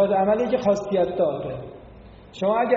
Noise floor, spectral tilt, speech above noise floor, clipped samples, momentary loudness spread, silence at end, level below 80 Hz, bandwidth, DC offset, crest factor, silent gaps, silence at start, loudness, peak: -45 dBFS; -5.5 dB/octave; 23 dB; under 0.1%; 16 LU; 0 s; -52 dBFS; 7.4 kHz; under 0.1%; 16 dB; none; 0 s; -23 LUFS; -8 dBFS